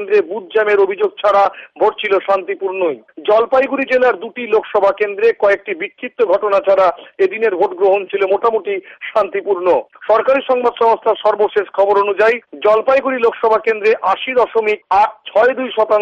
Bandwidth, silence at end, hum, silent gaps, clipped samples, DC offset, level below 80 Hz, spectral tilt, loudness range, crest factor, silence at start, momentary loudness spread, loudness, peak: 7.2 kHz; 0 s; none; none; under 0.1%; under 0.1%; -58 dBFS; -5 dB/octave; 2 LU; 12 dB; 0 s; 5 LU; -15 LUFS; -4 dBFS